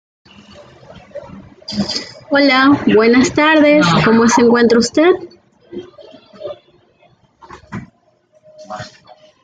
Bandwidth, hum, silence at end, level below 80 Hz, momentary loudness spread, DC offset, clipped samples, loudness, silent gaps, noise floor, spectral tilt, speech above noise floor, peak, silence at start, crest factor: 9.4 kHz; none; 0.55 s; -50 dBFS; 23 LU; under 0.1%; under 0.1%; -12 LUFS; none; -55 dBFS; -4.5 dB/octave; 44 dB; 0 dBFS; 1.15 s; 14 dB